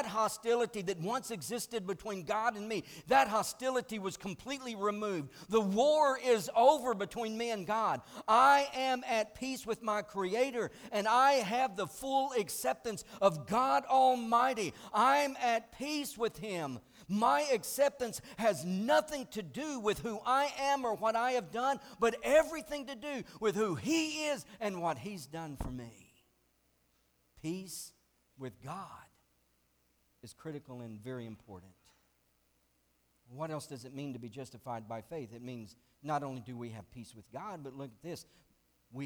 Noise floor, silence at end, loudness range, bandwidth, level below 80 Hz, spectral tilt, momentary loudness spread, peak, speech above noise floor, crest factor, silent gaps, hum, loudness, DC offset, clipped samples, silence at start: -75 dBFS; 0 s; 17 LU; over 20 kHz; -64 dBFS; -4 dB/octave; 18 LU; -14 dBFS; 41 dB; 20 dB; none; none; -33 LUFS; under 0.1%; under 0.1%; 0 s